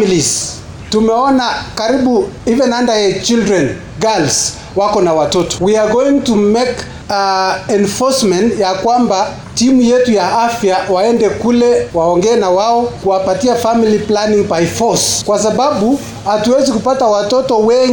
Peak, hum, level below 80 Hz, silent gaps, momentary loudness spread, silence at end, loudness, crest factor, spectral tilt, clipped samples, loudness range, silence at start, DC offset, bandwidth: -2 dBFS; none; -40 dBFS; none; 4 LU; 0 s; -12 LUFS; 8 dB; -4 dB/octave; under 0.1%; 1 LU; 0 s; under 0.1%; 17.5 kHz